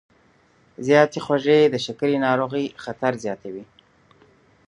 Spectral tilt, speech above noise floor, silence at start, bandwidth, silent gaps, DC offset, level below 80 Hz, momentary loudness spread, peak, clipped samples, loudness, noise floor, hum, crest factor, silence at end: -5.5 dB/octave; 38 dB; 0.8 s; 10.5 kHz; none; under 0.1%; -66 dBFS; 14 LU; -2 dBFS; under 0.1%; -21 LUFS; -58 dBFS; none; 22 dB; 1.05 s